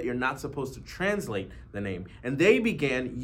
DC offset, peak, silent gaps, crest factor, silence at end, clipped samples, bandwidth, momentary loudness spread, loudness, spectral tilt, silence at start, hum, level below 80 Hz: under 0.1%; -8 dBFS; none; 20 dB; 0 s; under 0.1%; 16 kHz; 14 LU; -28 LUFS; -5.5 dB/octave; 0 s; none; -50 dBFS